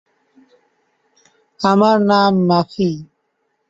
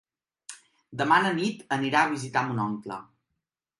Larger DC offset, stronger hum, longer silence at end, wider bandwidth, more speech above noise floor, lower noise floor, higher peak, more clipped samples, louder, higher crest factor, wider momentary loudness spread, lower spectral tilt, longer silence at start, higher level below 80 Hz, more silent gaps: neither; neither; about the same, 0.65 s vs 0.75 s; second, 7.8 kHz vs 11.5 kHz; about the same, 54 dB vs 57 dB; second, -68 dBFS vs -83 dBFS; first, -2 dBFS vs -8 dBFS; neither; first, -15 LUFS vs -26 LUFS; about the same, 16 dB vs 20 dB; second, 8 LU vs 21 LU; first, -7 dB/octave vs -5 dB/octave; first, 1.6 s vs 0.5 s; first, -58 dBFS vs -72 dBFS; neither